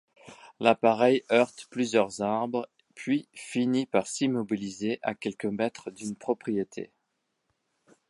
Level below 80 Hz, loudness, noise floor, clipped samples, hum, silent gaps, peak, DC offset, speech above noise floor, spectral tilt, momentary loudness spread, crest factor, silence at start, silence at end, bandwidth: -72 dBFS; -28 LUFS; -79 dBFS; under 0.1%; none; none; -4 dBFS; under 0.1%; 51 dB; -5 dB/octave; 14 LU; 24 dB; 0.25 s; 1.25 s; 11.5 kHz